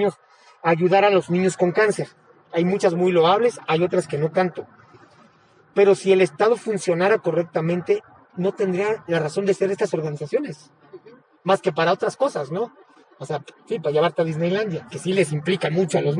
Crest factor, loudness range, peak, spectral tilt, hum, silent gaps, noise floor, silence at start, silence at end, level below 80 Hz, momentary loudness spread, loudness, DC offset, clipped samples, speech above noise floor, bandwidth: 18 dB; 5 LU; -4 dBFS; -6 dB/octave; none; none; -55 dBFS; 0 s; 0 s; -70 dBFS; 11 LU; -21 LUFS; under 0.1%; under 0.1%; 35 dB; 11 kHz